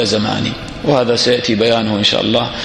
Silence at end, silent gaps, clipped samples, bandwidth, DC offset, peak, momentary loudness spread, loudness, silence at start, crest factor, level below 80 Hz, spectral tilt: 0 s; none; under 0.1%; 11.5 kHz; under 0.1%; 0 dBFS; 6 LU; -14 LUFS; 0 s; 14 dB; -42 dBFS; -4.5 dB/octave